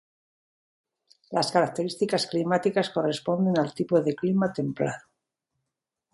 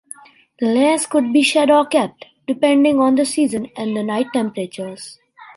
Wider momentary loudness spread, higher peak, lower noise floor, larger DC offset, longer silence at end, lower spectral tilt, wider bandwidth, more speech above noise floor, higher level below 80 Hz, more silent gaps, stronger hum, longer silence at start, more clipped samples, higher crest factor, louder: second, 5 LU vs 17 LU; second, -8 dBFS vs -2 dBFS; first, -85 dBFS vs -41 dBFS; neither; first, 1.15 s vs 0.1 s; first, -6 dB/octave vs -4 dB/octave; about the same, 11.5 kHz vs 11.5 kHz; first, 60 dB vs 25 dB; about the same, -70 dBFS vs -66 dBFS; neither; neither; first, 1.3 s vs 0.6 s; neither; about the same, 20 dB vs 16 dB; second, -26 LUFS vs -17 LUFS